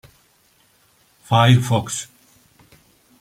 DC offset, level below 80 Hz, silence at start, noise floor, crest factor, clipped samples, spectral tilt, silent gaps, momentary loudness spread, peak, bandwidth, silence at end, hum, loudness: under 0.1%; -56 dBFS; 1.3 s; -58 dBFS; 20 dB; under 0.1%; -5.5 dB/octave; none; 14 LU; -2 dBFS; 15 kHz; 1.15 s; none; -18 LUFS